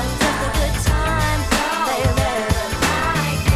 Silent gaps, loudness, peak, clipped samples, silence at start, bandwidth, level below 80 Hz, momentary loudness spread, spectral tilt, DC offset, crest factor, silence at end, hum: none; -19 LUFS; -2 dBFS; under 0.1%; 0 s; 16 kHz; -26 dBFS; 2 LU; -4.5 dB/octave; under 0.1%; 16 dB; 0 s; none